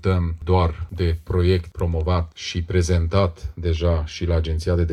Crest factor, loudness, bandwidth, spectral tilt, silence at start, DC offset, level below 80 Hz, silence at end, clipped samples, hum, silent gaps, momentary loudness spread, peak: 16 dB; -22 LUFS; 10 kHz; -7 dB/octave; 0 s; under 0.1%; -30 dBFS; 0 s; under 0.1%; none; none; 5 LU; -4 dBFS